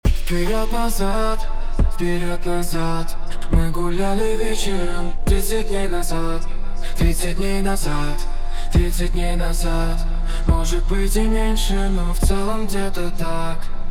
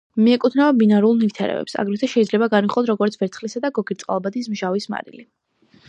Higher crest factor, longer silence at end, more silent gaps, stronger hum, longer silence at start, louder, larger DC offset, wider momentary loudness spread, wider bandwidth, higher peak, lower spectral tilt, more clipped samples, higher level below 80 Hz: about the same, 14 dB vs 16 dB; second, 0 s vs 0.65 s; neither; neither; about the same, 0.05 s vs 0.15 s; second, -23 LUFS vs -19 LUFS; first, 0.5% vs under 0.1%; second, 7 LU vs 10 LU; first, 15 kHz vs 9 kHz; about the same, -4 dBFS vs -4 dBFS; second, -5 dB/octave vs -6.5 dB/octave; neither; first, -18 dBFS vs -68 dBFS